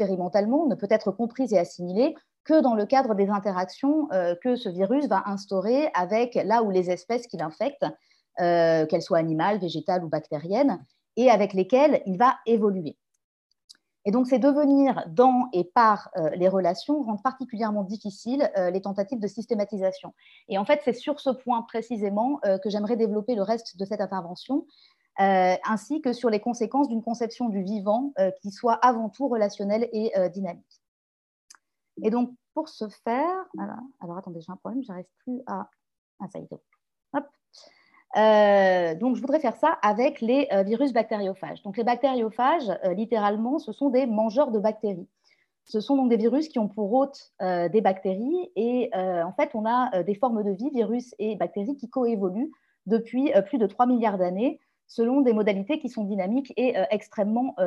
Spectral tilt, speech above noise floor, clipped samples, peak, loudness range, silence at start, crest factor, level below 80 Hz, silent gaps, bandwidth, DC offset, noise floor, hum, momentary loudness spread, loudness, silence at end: -7 dB/octave; 43 dB; under 0.1%; -6 dBFS; 7 LU; 0 s; 18 dB; -76 dBFS; 2.40-2.44 s, 13.24-13.50 s, 13.64-13.68 s, 30.88-31.48 s, 35.98-36.18 s; 10.5 kHz; under 0.1%; -67 dBFS; none; 12 LU; -25 LUFS; 0 s